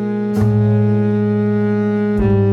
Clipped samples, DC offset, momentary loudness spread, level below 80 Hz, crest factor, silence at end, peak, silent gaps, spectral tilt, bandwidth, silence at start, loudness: under 0.1%; under 0.1%; 3 LU; -34 dBFS; 12 dB; 0 s; -2 dBFS; none; -10 dB/octave; 5.6 kHz; 0 s; -16 LUFS